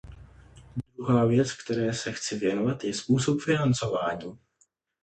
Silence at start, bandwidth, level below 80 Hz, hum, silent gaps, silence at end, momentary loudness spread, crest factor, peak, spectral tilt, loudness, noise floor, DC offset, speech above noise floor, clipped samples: 0.05 s; 9 kHz; -56 dBFS; none; none; 0.7 s; 14 LU; 18 dB; -10 dBFS; -5.5 dB/octave; -27 LUFS; -69 dBFS; under 0.1%; 43 dB; under 0.1%